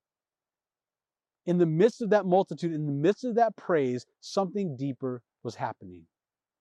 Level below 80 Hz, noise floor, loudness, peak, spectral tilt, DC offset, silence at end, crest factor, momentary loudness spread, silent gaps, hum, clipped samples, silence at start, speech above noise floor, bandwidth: -82 dBFS; under -90 dBFS; -28 LUFS; -10 dBFS; -7.5 dB/octave; under 0.1%; 0.6 s; 18 dB; 13 LU; none; none; under 0.1%; 1.45 s; over 63 dB; 10 kHz